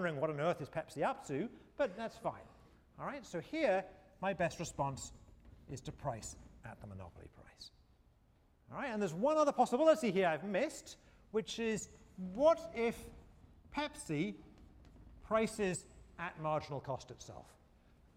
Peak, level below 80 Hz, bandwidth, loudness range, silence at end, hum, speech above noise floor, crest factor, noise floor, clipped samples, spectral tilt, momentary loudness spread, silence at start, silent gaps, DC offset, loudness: -18 dBFS; -64 dBFS; 16 kHz; 12 LU; 0.75 s; none; 32 dB; 22 dB; -69 dBFS; under 0.1%; -5 dB/octave; 22 LU; 0 s; none; under 0.1%; -37 LUFS